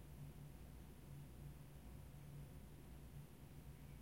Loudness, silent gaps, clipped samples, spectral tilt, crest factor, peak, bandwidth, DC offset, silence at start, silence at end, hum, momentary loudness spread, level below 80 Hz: -59 LUFS; none; under 0.1%; -6.5 dB/octave; 14 dB; -44 dBFS; 16.5 kHz; under 0.1%; 0 s; 0 s; none; 2 LU; -62 dBFS